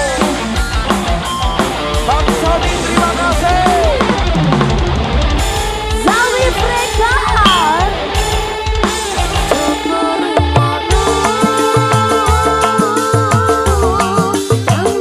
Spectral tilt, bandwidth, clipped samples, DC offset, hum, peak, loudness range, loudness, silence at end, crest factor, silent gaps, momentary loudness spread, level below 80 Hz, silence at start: -4.5 dB/octave; 15 kHz; under 0.1%; under 0.1%; none; 0 dBFS; 2 LU; -13 LUFS; 0 s; 12 dB; none; 4 LU; -20 dBFS; 0 s